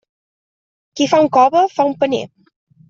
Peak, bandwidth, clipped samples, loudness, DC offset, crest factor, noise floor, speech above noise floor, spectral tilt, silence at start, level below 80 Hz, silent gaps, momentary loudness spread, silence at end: -2 dBFS; 7.6 kHz; under 0.1%; -15 LUFS; under 0.1%; 14 dB; under -90 dBFS; over 76 dB; -4.5 dB/octave; 0.95 s; -62 dBFS; none; 16 LU; 0.65 s